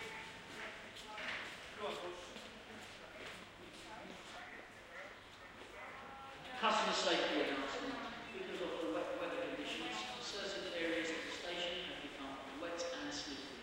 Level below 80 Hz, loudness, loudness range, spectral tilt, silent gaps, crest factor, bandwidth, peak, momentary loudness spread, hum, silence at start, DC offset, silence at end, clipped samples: -70 dBFS; -42 LUFS; 13 LU; -2.5 dB/octave; none; 22 dB; 16 kHz; -22 dBFS; 16 LU; none; 0 s; under 0.1%; 0 s; under 0.1%